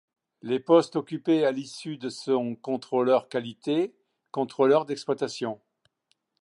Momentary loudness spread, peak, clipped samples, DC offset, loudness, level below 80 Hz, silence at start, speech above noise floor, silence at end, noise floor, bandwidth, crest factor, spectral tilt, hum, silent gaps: 13 LU; -6 dBFS; under 0.1%; under 0.1%; -27 LUFS; -80 dBFS; 0.45 s; 48 dB; 0.9 s; -74 dBFS; 11 kHz; 20 dB; -6 dB/octave; none; none